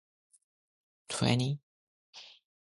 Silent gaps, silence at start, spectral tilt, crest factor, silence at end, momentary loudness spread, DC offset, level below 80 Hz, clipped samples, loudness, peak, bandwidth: 1.63-2.13 s; 1.1 s; -5 dB/octave; 24 dB; 0.4 s; 24 LU; under 0.1%; -64 dBFS; under 0.1%; -32 LUFS; -14 dBFS; 11.5 kHz